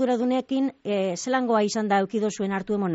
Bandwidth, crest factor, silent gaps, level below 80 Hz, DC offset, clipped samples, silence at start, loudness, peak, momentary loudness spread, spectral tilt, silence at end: 8 kHz; 14 dB; none; -66 dBFS; under 0.1%; under 0.1%; 0 s; -25 LUFS; -10 dBFS; 4 LU; -5 dB/octave; 0 s